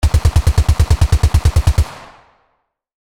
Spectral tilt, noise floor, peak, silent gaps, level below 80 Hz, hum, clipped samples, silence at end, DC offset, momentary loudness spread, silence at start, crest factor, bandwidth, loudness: -5.5 dB/octave; -66 dBFS; 0 dBFS; none; -18 dBFS; none; under 0.1%; 1 s; under 0.1%; 3 LU; 0 s; 14 dB; 15.5 kHz; -15 LUFS